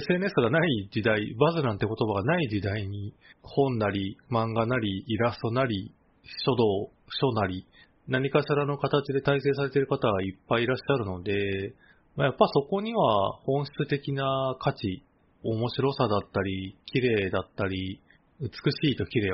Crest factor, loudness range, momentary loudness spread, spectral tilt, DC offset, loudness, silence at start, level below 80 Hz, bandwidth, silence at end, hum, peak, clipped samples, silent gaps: 22 dB; 2 LU; 10 LU; -5 dB/octave; under 0.1%; -27 LUFS; 0 s; -58 dBFS; 5.8 kHz; 0 s; none; -6 dBFS; under 0.1%; none